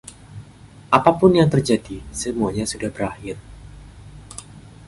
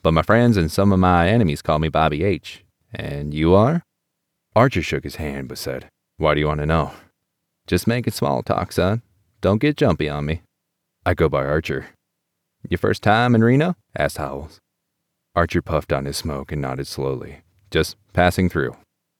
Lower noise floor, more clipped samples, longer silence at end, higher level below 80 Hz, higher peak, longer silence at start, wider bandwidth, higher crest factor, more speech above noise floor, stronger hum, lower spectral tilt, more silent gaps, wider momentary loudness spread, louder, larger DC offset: second, -44 dBFS vs -77 dBFS; neither; second, 0.25 s vs 0.45 s; second, -44 dBFS vs -38 dBFS; first, 0 dBFS vs -4 dBFS; about the same, 0.05 s vs 0.05 s; second, 11.5 kHz vs 16.5 kHz; about the same, 20 dB vs 18 dB; second, 25 dB vs 58 dB; neither; about the same, -6 dB/octave vs -6.5 dB/octave; neither; first, 24 LU vs 13 LU; about the same, -19 LUFS vs -20 LUFS; neither